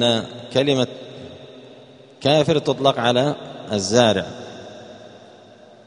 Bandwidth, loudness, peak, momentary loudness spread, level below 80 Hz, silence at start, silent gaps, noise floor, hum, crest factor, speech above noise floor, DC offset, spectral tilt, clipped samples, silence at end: 10.5 kHz; -19 LUFS; 0 dBFS; 22 LU; -58 dBFS; 0 s; none; -46 dBFS; none; 22 dB; 27 dB; under 0.1%; -4.5 dB/octave; under 0.1%; 0.8 s